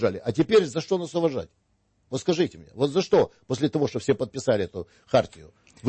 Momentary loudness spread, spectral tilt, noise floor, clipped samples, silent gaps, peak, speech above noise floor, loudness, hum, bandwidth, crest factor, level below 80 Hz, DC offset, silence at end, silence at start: 12 LU; -6 dB/octave; -68 dBFS; under 0.1%; none; -8 dBFS; 43 dB; -25 LUFS; none; 8.8 kHz; 18 dB; -58 dBFS; under 0.1%; 0 s; 0 s